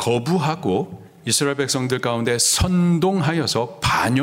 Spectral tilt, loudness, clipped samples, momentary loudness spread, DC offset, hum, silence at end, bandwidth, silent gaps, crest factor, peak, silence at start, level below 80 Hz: -4 dB/octave; -19 LUFS; under 0.1%; 6 LU; under 0.1%; none; 0 s; 16 kHz; none; 16 dB; -4 dBFS; 0 s; -42 dBFS